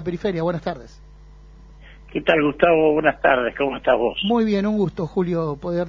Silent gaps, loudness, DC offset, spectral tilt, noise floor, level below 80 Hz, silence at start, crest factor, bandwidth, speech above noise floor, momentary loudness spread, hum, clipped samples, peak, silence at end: none; -20 LUFS; under 0.1%; -7.5 dB/octave; -44 dBFS; -46 dBFS; 0 s; 18 dB; 7.4 kHz; 24 dB; 8 LU; none; under 0.1%; -2 dBFS; 0 s